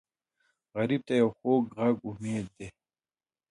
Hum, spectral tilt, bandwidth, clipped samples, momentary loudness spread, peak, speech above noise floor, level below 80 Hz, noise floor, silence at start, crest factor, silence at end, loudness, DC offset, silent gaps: none; -7 dB/octave; 11 kHz; under 0.1%; 16 LU; -14 dBFS; over 61 dB; -66 dBFS; under -90 dBFS; 0.75 s; 18 dB; 0.8 s; -29 LUFS; under 0.1%; none